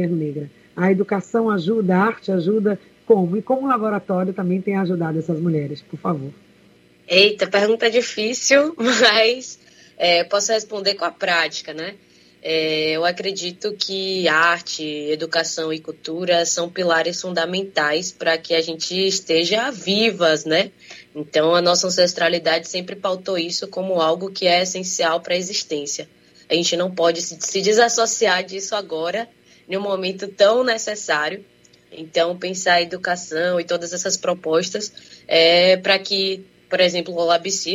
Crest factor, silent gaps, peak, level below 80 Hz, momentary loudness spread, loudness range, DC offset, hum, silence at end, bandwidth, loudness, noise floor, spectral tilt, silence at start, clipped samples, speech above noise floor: 20 dB; none; 0 dBFS; -70 dBFS; 11 LU; 4 LU; under 0.1%; none; 0 s; 15.5 kHz; -19 LUFS; -53 dBFS; -3 dB/octave; 0 s; under 0.1%; 33 dB